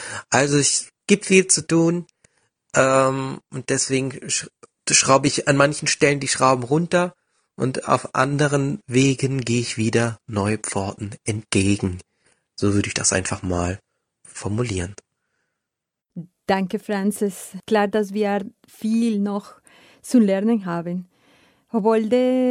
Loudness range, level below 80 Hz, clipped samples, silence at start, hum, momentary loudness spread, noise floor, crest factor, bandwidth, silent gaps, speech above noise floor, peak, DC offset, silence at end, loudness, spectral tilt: 7 LU; -54 dBFS; under 0.1%; 0 s; none; 13 LU; -84 dBFS; 20 dB; 15 kHz; none; 64 dB; 0 dBFS; under 0.1%; 0 s; -20 LUFS; -4 dB/octave